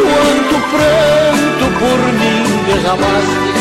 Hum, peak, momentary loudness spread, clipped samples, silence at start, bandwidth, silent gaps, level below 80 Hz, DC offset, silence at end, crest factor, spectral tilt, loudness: none; -4 dBFS; 3 LU; under 0.1%; 0 s; 16 kHz; none; -34 dBFS; 0.3%; 0 s; 6 dB; -4.5 dB/octave; -11 LUFS